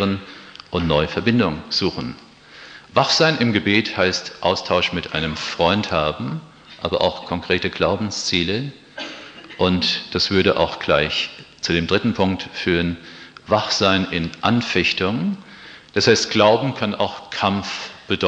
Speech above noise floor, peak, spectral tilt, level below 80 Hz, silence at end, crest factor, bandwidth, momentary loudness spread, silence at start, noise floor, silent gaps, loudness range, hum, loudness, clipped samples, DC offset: 23 dB; -2 dBFS; -4.5 dB/octave; -46 dBFS; 0 s; 20 dB; 9.4 kHz; 16 LU; 0 s; -43 dBFS; none; 3 LU; none; -20 LUFS; under 0.1%; under 0.1%